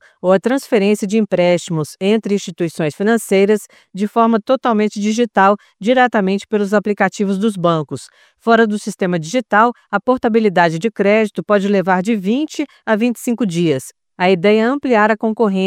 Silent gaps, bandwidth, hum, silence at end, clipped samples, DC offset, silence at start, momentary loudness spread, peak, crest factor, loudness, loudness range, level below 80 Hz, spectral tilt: none; 15 kHz; none; 0 s; under 0.1%; under 0.1%; 0.25 s; 7 LU; 0 dBFS; 16 dB; -16 LUFS; 2 LU; -62 dBFS; -6 dB/octave